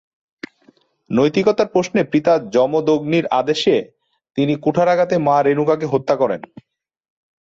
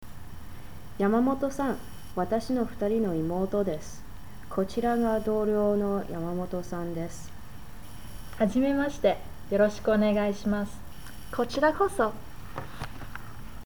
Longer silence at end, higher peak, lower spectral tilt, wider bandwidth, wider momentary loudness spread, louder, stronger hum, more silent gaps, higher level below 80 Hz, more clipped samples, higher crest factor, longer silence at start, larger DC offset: first, 1 s vs 0 s; first, -4 dBFS vs -12 dBFS; about the same, -6.5 dB/octave vs -6.5 dB/octave; second, 7.8 kHz vs over 20 kHz; second, 9 LU vs 21 LU; first, -17 LUFS vs -28 LUFS; neither; neither; second, -58 dBFS vs -46 dBFS; neither; about the same, 14 dB vs 18 dB; first, 1.1 s vs 0 s; second, under 0.1% vs 1%